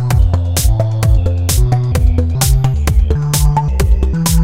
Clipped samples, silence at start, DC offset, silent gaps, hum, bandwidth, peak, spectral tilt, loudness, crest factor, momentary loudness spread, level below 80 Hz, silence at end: under 0.1%; 0 s; 2%; none; none; 16.5 kHz; 0 dBFS; -5.5 dB/octave; -14 LUFS; 12 dB; 1 LU; -14 dBFS; 0 s